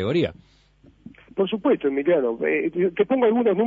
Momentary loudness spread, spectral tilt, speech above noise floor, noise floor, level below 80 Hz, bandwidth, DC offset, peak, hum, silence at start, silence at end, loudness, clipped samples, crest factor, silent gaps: 7 LU; -8.5 dB/octave; 27 dB; -48 dBFS; -58 dBFS; 7.2 kHz; under 0.1%; -8 dBFS; none; 0 s; 0 s; -22 LUFS; under 0.1%; 16 dB; none